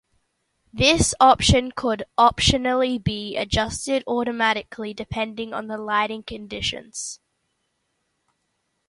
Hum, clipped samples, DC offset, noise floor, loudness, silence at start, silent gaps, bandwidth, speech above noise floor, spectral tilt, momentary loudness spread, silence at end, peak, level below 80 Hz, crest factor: none; under 0.1%; under 0.1%; -74 dBFS; -21 LUFS; 0.75 s; none; 11.5 kHz; 52 dB; -3.5 dB/octave; 16 LU; 1.75 s; -2 dBFS; -38 dBFS; 22 dB